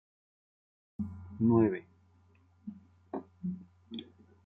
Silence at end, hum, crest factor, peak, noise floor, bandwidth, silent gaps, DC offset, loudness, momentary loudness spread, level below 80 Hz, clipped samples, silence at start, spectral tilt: 0.4 s; none; 20 dB; -16 dBFS; -65 dBFS; 3.9 kHz; none; under 0.1%; -33 LUFS; 22 LU; -70 dBFS; under 0.1%; 1 s; -11 dB/octave